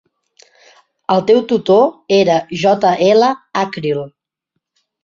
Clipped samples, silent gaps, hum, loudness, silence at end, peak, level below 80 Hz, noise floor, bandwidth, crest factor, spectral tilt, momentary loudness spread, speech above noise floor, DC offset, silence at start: under 0.1%; none; none; -14 LUFS; 0.95 s; -2 dBFS; -58 dBFS; -75 dBFS; 7.4 kHz; 14 dB; -5.5 dB/octave; 9 LU; 62 dB; under 0.1%; 1.1 s